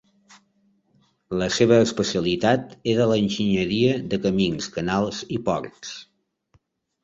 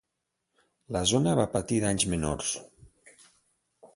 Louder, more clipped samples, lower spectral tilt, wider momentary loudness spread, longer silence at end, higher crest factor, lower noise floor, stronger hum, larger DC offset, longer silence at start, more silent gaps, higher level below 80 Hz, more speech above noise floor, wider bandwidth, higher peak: first, -22 LUFS vs -28 LUFS; neither; about the same, -5.5 dB/octave vs -4.5 dB/octave; first, 11 LU vs 8 LU; first, 1 s vs 0.1 s; about the same, 20 dB vs 20 dB; second, -65 dBFS vs -83 dBFS; neither; neither; first, 1.3 s vs 0.9 s; neither; about the same, -52 dBFS vs -50 dBFS; second, 43 dB vs 56 dB; second, 8 kHz vs 11.5 kHz; first, -4 dBFS vs -10 dBFS